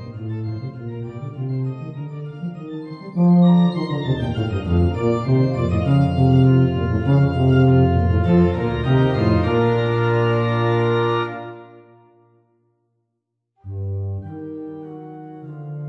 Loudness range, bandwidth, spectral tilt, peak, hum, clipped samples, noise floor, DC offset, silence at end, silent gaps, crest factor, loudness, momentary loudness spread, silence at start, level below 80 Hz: 16 LU; 6 kHz; -9.5 dB/octave; -4 dBFS; none; under 0.1%; -76 dBFS; under 0.1%; 0 s; none; 14 dB; -18 LUFS; 18 LU; 0 s; -38 dBFS